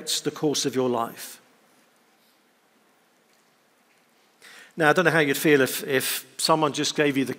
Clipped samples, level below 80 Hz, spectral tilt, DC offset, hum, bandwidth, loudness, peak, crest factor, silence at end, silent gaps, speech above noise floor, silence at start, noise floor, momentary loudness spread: under 0.1%; -76 dBFS; -3.5 dB/octave; under 0.1%; none; 16 kHz; -23 LUFS; -2 dBFS; 22 dB; 0 s; none; 39 dB; 0 s; -63 dBFS; 10 LU